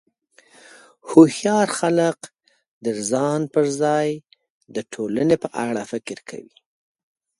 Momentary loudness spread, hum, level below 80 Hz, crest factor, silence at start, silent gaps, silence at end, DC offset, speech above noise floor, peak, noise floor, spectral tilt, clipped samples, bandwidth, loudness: 19 LU; none; -64 dBFS; 22 dB; 1.05 s; 2.68-2.81 s, 4.50-4.61 s; 0.95 s; under 0.1%; 37 dB; 0 dBFS; -57 dBFS; -5.5 dB/octave; under 0.1%; 11.5 kHz; -20 LUFS